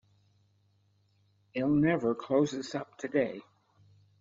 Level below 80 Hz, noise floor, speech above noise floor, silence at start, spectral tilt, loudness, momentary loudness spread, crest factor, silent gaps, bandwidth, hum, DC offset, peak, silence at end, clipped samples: -66 dBFS; -70 dBFS; 40 dB; 1.55 s; -6 dB/octave; -31 LUFS; 12 LU; 18 dB; none; 7.4 kHz; 50 Hz at -55 dBFS; under 0.1%; -16 dBFS; 0.8 s; under 0.1%